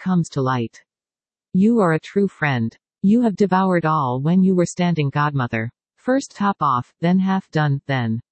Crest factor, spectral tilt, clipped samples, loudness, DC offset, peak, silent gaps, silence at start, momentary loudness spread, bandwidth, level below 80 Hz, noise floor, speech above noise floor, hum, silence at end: 16 dB; -7 dB/octave; under 0.1%; -20 LUFS; under 0.1%; -4 dBFS; none; 0 s; 7 LU; 8.6 kHz; -60 dBFS; under -90 dBFS; over 71 dB; none; 0.1 s